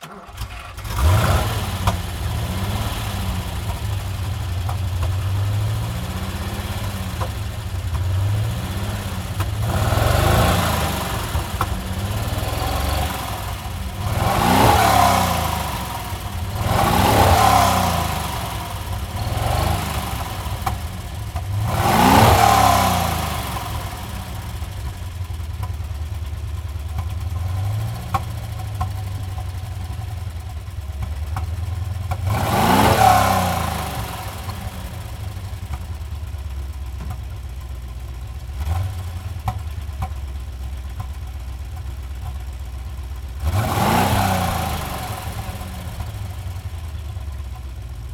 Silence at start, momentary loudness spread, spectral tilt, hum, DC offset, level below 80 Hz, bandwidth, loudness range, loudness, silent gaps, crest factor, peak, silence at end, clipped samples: 0 s; 16 LU; -5 dB/octave; none; under 0.1%; -30 dBFS; 18.5 kHz; 12 LU; -22 LUFS; none; 20 dB; 0 dBFS; 0 s; under 0.1%